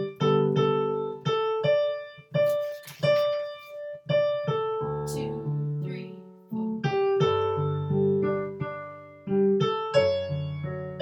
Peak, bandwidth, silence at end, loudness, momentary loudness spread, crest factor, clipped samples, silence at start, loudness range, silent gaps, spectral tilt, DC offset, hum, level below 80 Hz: -10 dBFS; 18.5 kHz; 0 s; -27 LUFS; 13 LU; 16 dB; under 0.1%; 0 s; 3 LU; none; -7 dB/octave; under 0.1%; none; -62 dBFS